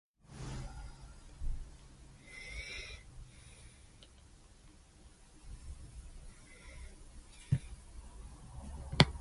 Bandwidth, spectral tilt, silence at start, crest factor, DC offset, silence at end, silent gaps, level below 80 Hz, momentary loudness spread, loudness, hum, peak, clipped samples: 11.5 kHz; -5 dB/octave; 0.25 s; 40 dB; under 0.1%; 0 s; none; -50 dBFS; 23 LU; -41 LUFS; none; -2 dBFS; under 0.1%